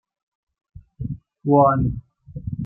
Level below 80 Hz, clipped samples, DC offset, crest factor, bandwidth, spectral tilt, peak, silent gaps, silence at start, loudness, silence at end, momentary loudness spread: -42 dBFS; under 0.1%; under 0.1%; 20 dB; 2.9 kHz; -14.5 dB/octave; -2 dBFS; none; 0.75 s; -19 LUFS; 0 s; 19 LU